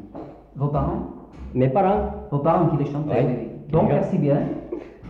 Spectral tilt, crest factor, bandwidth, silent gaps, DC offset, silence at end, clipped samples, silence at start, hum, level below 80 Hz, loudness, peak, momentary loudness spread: -10.5 dB/octave; 16 dB; 4.5 kHz; none; under 0.1%; 0 s; under 0.1%; 0 s; none; -40 dBFS; -22 LUFS; -8 dBFS; 16 LU